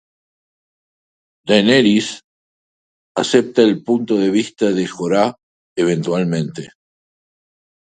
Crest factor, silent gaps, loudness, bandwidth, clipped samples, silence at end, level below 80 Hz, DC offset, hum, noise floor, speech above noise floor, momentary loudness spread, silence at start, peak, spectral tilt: 18 dB; 2.24-3.15 s, 5.43-5.76 s; -16 LUFS; 9.4 kHz; under 0.1%; 1.25 s; -60 dBFS; under 0.1%; none; under -90 dBFS; over 74 dB; 14 LU; 1.45 s; 0 dBFS; -5.5 dB/octave